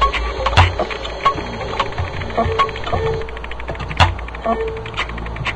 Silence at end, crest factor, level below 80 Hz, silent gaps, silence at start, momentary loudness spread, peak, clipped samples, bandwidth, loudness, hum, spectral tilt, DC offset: 0 s; 20 dB; -28 dBFS; none; 0 s; 10 LU; 0 dBFS; under 0.1%; 9.8 kHz; -20 LUFS; none; -5.5 dB/octave; under 0.1%